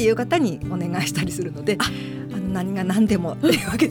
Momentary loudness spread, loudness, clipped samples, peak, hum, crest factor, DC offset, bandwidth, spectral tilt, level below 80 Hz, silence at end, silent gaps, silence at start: 7 LU; -22 LUFS; under 0.1%; -6 dBFS; none; 16 dB; under 0.1%; 19.5 kHz; -5.5 dB/octave; -44 dBFS; 0 s; none; 0 s